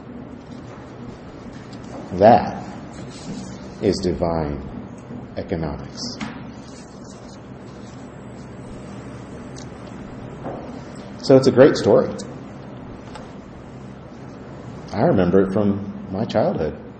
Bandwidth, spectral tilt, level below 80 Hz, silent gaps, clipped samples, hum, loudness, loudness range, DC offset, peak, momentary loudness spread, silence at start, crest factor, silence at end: 8.8 kHz; -7 dB/octave; -46 dBFS; none; under 0.1%; none; -19 LUFS; 17 LU; under 0.1%; 0 dBFS; 23 LU; 0 s; 22 dB; 0 s